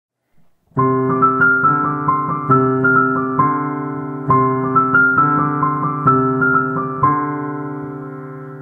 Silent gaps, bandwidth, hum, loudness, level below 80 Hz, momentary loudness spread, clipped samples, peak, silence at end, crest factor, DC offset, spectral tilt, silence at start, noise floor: none; 3.2 kHz; none; -15 LUFS; -56 dBFS; 13 LU; under 0.1%; -2 dBFS; 0 s; 14 dB; under 0.1%; -11.5 dB/octave; 0.75 s; -54 dBFS